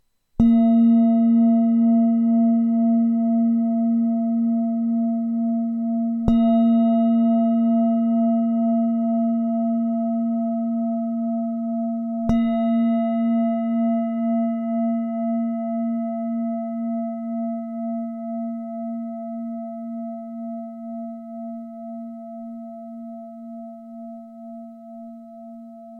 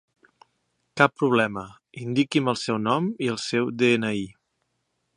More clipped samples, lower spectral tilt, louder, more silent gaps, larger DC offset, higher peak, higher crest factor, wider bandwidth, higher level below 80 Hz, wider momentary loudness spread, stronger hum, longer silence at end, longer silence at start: neither; first, -10.5 dB/octave vs -5.5 dB/octave; first, -21 LUFS vs -24 LUFS; neither; neither; second, -4 dBFS vs 0 dBFS; second, 18 dB vs 24 dB; second, 4 kHz vs 11 kHz; first, -48 dBFS vs -66 dBFS; first, 19 LU vs 16 LU; neither; second, 0 s vs 0.85 s; second, 0.4 s vs 0.95 s